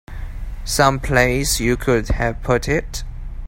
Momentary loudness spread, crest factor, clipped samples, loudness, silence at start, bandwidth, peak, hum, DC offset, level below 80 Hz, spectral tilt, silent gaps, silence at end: 17 LU; 18 dB; under 0.1%; -18 LUFS; 0.1 s; 16.5 kHz; 0 dBFS; none; under 0.1%; -28 dBFS; -4.5 dB/octave; none; 0 s